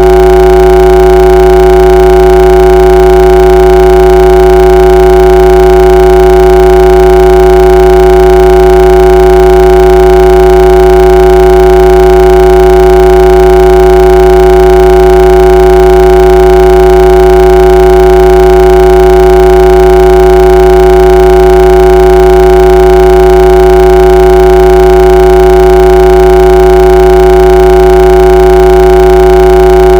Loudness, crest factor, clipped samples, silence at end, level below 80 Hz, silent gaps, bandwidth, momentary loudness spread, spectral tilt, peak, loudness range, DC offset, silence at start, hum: -3 LUFS; 2 dB; 30%; 0 s; -10 dBFS; none; 17 kHz; 0 LU; -7 dB/octave; 0 dBFS; 0 LU; under 0.1%; 0 s; none